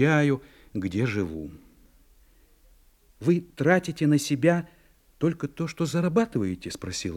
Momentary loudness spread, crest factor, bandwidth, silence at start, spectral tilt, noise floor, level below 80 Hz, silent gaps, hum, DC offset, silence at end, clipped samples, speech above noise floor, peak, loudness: 10 LU; 22 dB; 15.5 kHz; 0 s; -6 dB/octave; -58 dBFS; -56 dBFS; none; none; under 0.1%; 0 s; under 0.1%; 33 dB; -6 dBFS; -26 LUFS